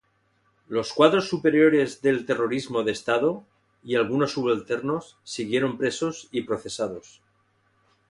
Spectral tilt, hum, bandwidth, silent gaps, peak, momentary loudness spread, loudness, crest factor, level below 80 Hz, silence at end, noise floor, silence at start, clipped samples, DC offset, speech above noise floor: -5 dB/octave; none; 11.5 kHz; none; -4 dBFS; 12 LU; -24 LUFS; 20 dB; -64 dBFS; 1.1 s; -67 dBFS; 0.7 s; under 0.1%; under 0.1%; 43 dB